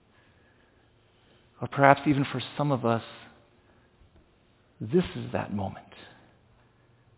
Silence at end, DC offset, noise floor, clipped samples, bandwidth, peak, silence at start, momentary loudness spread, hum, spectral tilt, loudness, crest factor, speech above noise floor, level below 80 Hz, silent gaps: 1.1 s; under 0.1%; -63 dBFS; under 0.1%; 4 kHz; -2 dBFS; 1.6 s; 25 LU; none; -5.5 dB/octave; -27 LUFS; 30 dB; 37 dB; -58 dBFS; none